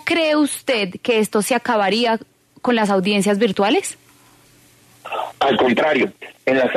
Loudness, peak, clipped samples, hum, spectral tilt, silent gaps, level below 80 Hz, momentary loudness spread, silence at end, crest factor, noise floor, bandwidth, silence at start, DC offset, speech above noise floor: -18 LUFS; -6 dBFS; under 0.1%; none; -4 dB/octave; none; -62 dBFS; 9 LU; 0 s; 14 dB; -51 dBFS; 13.5 kHz; 0.05 s; under 0.1%; 33 dB